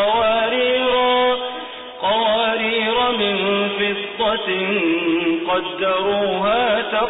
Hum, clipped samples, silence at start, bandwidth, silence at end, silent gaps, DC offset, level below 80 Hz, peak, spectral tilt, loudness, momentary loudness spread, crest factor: none; under 0.1%; 0 s; 4 kHz; 0 s; none; under 0.1%; -52 dBFS; -8 dBFS; -9 dB/octave; -18 LUFS; 5 LU; 10 dB